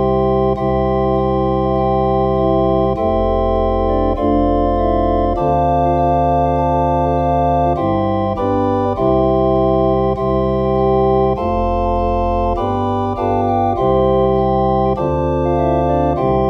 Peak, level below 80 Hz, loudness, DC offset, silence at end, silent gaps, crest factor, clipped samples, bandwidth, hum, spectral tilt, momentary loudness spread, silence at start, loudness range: -4 dBFS; -26 dBFS; -16 LUFS; under 0.1%; 0 s; none; 12 dB; under 0.1%; 6.2 kHz; none; -10 dB/octave; 3 LU; 0 s; 1 LU